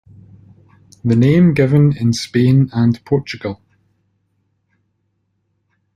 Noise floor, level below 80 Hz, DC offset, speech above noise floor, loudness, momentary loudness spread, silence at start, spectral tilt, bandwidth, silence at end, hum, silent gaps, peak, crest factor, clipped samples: -67 dBFS; -50 dBFS; under 0.1%; 54 dB; -15 LUFS; 14 LU; 1.05 s; -7.5 dB/octave; 10.5 kHz; 2.4 s; none; none; -2 dBFS; 16 dB; under 0.1%